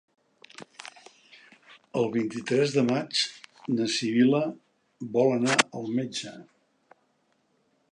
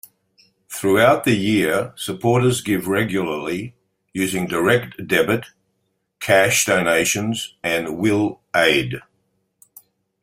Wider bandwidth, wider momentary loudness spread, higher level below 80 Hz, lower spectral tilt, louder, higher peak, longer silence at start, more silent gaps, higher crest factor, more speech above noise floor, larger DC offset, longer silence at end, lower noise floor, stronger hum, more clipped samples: second, 11 kHz vs 16 kHz; first, 21 LU vs 12 LU; second, -76 dBFS vs -54 dBFS; about the same, -4.5 dB/octave vs -4 dB/octave; second, -26 LUFS vs -19 LUFS; about the same, -2 dBFS vs -2 dBFS; about the same, 0.6 s vs 0.7 s; neither; first, 26 dB vs 20 dB; second, 45 dB vs 52 dB; neither; first, 1.5 s vs 1.25 s; about the same, -70 dBFS vs -71 dBFS; neither; neither